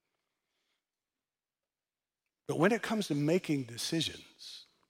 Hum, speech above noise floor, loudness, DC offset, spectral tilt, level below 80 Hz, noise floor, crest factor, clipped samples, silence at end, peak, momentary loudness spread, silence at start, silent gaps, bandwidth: none; over 58 dB; -32 LUFS; under 0.1%; -5 dB/octave; -76 dBFS; under -90 dBFS; 22 dB; under 0.1%; 0.25 s; -14 dBFS; 18 LU; 2.5 s; none; 16.5 kHz